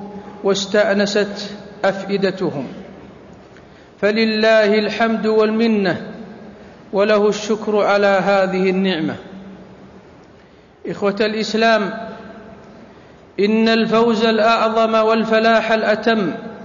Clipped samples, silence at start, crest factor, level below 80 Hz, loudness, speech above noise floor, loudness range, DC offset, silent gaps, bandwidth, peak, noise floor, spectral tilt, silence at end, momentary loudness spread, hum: under 0.1%; 0 s; 14 dB; -56 dBFS; -16 LUFS; 30 dB; 6 LU; under 0.1%; none; 7.4 kHz; -4 dBFS; -46 dBFS; -5 dB/octave; 0 s; 18 LU; none